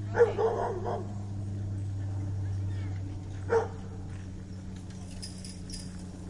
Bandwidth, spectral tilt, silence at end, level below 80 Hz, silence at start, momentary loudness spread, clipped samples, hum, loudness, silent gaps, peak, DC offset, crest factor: 11.5 kHz; -6.5 dB/octave; 0 s; -48 dBFS; 0 s; 13 LU; under 0.1%; none; -34 LUFS; none; -12 dBFS; under 0.1%; 22 dB